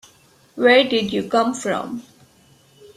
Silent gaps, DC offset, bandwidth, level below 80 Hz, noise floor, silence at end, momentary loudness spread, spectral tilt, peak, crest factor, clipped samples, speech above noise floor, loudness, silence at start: none; under 0.1%; 13.5 kHz; -62 dBFS; -54 dBFS; 0.95 s; 18 LU; -4 dB/octave; -2 dBFS; 18 dB; under 0.1%; 36 dB; -18 LUFS; 0.55 s